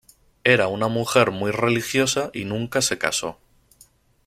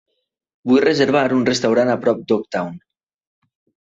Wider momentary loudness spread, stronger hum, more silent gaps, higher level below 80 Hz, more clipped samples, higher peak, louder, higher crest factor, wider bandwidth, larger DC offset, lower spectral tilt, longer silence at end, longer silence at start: about the same, 8 LU vs 10 LU; neither; neither; about the same, -56 dBFS vs -60 dBFS; neither; about the same, -2 dBFS vs -4 dBFS; second, -21 LUFS vs -17 LUFS; about the same, 20 dB vs 16 dB; first, 16 kHz vs 8 kHz; neither; second, -3.5 dB/octave vs -5 dB/octave; second, 0.95 s vs 1.1 s; second, 0.45 s vs 0.65 s